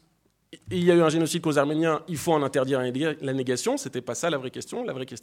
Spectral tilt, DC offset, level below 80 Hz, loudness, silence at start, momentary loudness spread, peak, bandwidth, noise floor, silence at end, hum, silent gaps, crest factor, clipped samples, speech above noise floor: -5 dB/octave; under 0.1%; -64 dBFS; -25 LUFS; 0.5 s; 12 LU; -6 dBFS; 16.5 kHz; -67 dBFS; 0.05 s; none; none; 18 dB; under 0.1%; 42 dB